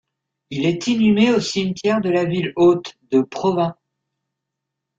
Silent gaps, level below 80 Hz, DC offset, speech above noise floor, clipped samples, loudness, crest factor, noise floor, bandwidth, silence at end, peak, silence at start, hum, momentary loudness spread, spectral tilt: none; -58 dBFS; under 0.1%; 63 dB; under 0.1%; -19 LUFS; 16 dB; -81 dBFS; 7.8 kHz; 1.25 s; -4 dBFS; 0.5 s; none; 7 LU; -6 dB/octave